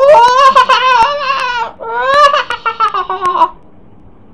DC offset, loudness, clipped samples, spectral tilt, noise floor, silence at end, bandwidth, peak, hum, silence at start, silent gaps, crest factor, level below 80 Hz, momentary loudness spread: 1%; -10 LUFS; 2%; -2 dB/octave; -41 dBFS; 0.8 s; 11 kHz; 0 dBFS; none; 0 s; none; 10 dB; -44 dBFS; 11 LU